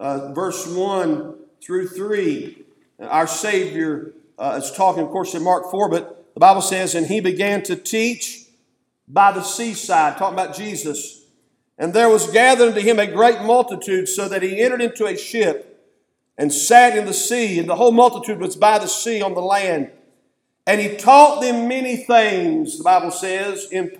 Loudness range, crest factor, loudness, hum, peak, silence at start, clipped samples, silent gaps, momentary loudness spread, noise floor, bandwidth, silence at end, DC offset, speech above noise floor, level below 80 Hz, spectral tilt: 6 LU; 18 dB; -17 LUFS; none; 0 dBFS; 0 s; under 0.1%; none; 13 LU; -67 dBFS; 18 kHz; 0.05 s; under 0.1%; 50 dB; -74 dBFS; -3 dB/octave